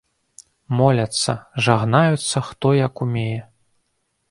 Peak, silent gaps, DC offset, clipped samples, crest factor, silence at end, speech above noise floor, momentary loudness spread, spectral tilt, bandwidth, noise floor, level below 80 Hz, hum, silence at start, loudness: 0 dBFS; none; under 0.1%; under 0.1%; 20 dB; 0.85 s; 52 dB; 8 LU; -5.5 dB/octave; 11.5 kHz; -70 dBFS; -54 dBFS; none; 0.7 s; -19 LUFS